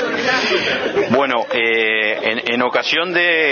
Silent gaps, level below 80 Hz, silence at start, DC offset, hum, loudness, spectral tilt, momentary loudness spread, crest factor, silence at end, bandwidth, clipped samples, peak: none; -58 dBFS; 0 s; under 0.1%; none; -16 LUFS; -3.5 dB/octave; 3 LU; 16 dB; 0 s; 6.8 kHz; under 0.1%; 0 dBFS